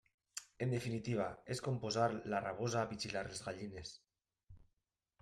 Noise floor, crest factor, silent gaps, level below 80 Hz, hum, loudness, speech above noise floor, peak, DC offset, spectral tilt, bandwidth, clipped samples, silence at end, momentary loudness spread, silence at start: -87 dBFS; 20 dB; none; -70 dBFS; none; -41 LUFS; 47 dB; -22 dBFS; under 0.1%; -5 dB/octave; 14 kHz; under 0.1%; 0.65 s; 14 LU; 0.35 s